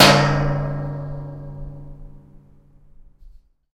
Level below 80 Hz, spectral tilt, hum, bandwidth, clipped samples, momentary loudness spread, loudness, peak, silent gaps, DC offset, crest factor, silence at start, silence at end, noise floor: -36 dBFS; -4.5 dB/octave; none; 16 kHz; under 0.1%; 22 LU; -20 LUFS; 0 dBFS; none; under 0.1%; 22 dB; 0 s; 0.45 s; -49 dBFS